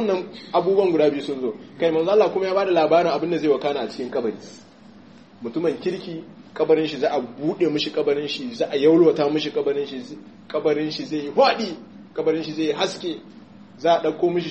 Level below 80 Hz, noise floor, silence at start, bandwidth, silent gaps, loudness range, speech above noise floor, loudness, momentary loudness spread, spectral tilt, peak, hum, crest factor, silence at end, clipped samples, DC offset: -70 dBFS; -47 dBFS; 0 s; 8.4 kHz; none; 5 LU; 25 dB; -22 LUFS; 13 LU; -6 dB/octave; -4 dBFS; none; 16 dB; 0 s; under 0.1%; 0.1%